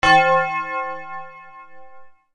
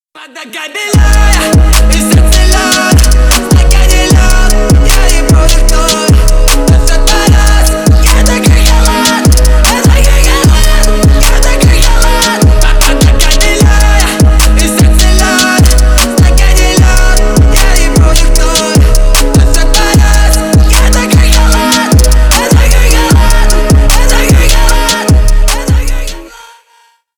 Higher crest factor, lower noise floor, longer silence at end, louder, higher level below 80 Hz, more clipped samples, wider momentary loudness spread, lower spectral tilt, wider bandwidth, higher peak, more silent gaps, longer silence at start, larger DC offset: first, 20 dB vs 4 dB; about the same, -45 dBFS vs -47 dBFS; second, 0 s vs 0.9 s; second, -19 LUFS vs -7 LUFS; second, -48 dBFS vs -6 dBFS; second, under 0.1% vs 0.2%; first, 24 LU vs 2 LU; about the same, -3.5 dB/octave vs -4 dB/octave; second, 10 kHz vs over 20 kHz; about the same, -2 dBFS vs 0 dBFS; neither; second, 0 s vs 0.15 s; first, 0.9% vs under 0.1%